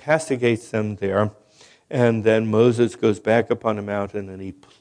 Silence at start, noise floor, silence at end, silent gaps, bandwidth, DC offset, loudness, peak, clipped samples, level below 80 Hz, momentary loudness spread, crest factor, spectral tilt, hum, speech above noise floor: 0.05 s; -47 dBFS; 0.3 s; none; 10.5 kHz; under 0.1%; -21 LUFS; -2 dBFS; under 0.1%; -62 dBFS; 12 LU; 18 dB; -6.5 dB/octave; none; 26 dB